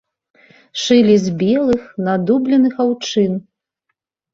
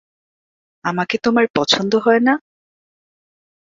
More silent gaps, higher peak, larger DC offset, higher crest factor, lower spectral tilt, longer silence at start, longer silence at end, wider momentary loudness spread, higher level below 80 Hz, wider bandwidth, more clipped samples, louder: second, none vs 1.50-1.54 s; about the same, -2 dBFS vs 0 dBFS; neither; second, 14 dB vs 20 dB; first, -6 dB/octave vs -4.5 dB/octave; about the same, 0.75 s vs 0.85 s; second, 0.9 s vs 1.25 s; about the same, 8 LU vs 9 LU; first, -54 dBFS vs -62 dBFS; about the same, 7.8 kHz vs 7.6 kHz; neither; about the same, -15 LUFS vs -17 LUFS